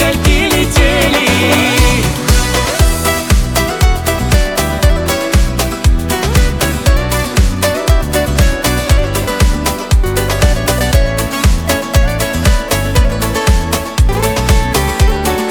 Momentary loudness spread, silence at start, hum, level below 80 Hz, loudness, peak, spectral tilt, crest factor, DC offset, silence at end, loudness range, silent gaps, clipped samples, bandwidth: 4 LU; 0 s; none; -14 dBFS; -12 LUFS; 0 dBFS; -4.5 dB/octave; 10 dB; under 0.1%; 0 s; 2 LU; none; under 0.1%; 20 kHz